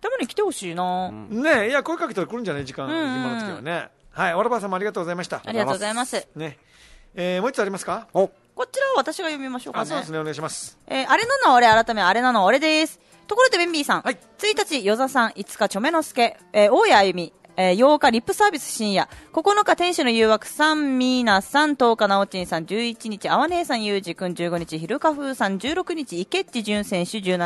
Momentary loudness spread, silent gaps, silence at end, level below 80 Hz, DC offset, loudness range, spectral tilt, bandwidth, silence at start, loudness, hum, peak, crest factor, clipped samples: 12 LU; none; 0 s; -58 dBFS; under 0.1%; 7 LU; -4 dB/octave; 12.5 kHz; 0.05 s; -21 LUFS; none; -4 dBFS; 18 dB; under 0.1%